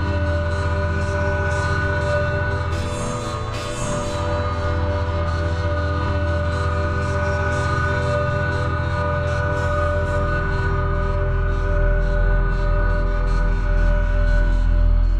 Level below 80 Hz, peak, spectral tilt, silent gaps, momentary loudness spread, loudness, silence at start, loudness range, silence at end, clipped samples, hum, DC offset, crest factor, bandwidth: -22 dBFS; -8 dBFS; -6.5 dB/octave; none; 3 LU; -22 LUFS; 0 s; 2 LU; 0 s; under 0.1%; none; 0.6%; 12 dB; 10 kHz